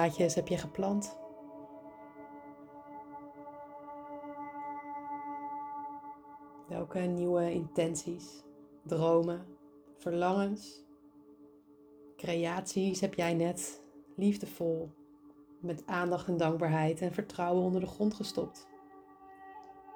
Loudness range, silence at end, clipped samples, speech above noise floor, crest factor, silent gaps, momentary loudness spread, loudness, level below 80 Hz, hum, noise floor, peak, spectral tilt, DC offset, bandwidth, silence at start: 11 LU; 0 s; under 0.1%; 26 dB; 20 dB; none; 21 LU; -34 LUFS; -68 dBFS; none; -59 dBFS; -16 dBFS; -6 dB/octave; under 0.1%; over 20 kHz; 0 s